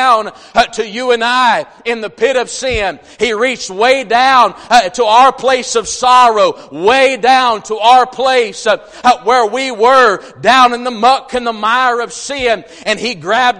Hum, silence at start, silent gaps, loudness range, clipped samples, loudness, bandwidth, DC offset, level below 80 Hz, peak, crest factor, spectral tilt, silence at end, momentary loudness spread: none; 0 s; none; 4 LU; 0.2%; -11 LUFS; 11.5 kHz; under 0.1%; -44 dBFS; 0 dBFS; 12 dB; -2 dB/octave; 0 s; 8 LU